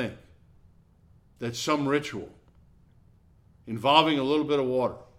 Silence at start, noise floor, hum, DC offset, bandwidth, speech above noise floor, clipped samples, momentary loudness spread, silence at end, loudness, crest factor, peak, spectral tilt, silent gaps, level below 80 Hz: 0 s; -59 dBFS; none; under 0.1%; 15.5 kHz; 33 dB; under 0.1%; 17 LU; 0.15 s; -26 LUFS; 26 dB; -4 dBFS; -4.5 dB/octave; none; -62 dBFS